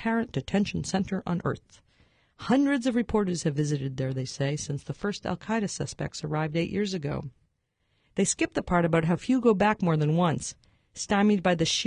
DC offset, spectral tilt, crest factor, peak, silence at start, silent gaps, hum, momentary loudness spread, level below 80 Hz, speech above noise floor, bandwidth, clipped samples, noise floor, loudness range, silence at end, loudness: under 0.1%; -5.5 dB/octave; 18 dB; -8 dBFS; 0 s; none; none; 10 LU; -52 dBFS; 47 dB; 11 kHz; under 0.1%; -74 dBFS; 5 LU; 0 s; -27 LUFS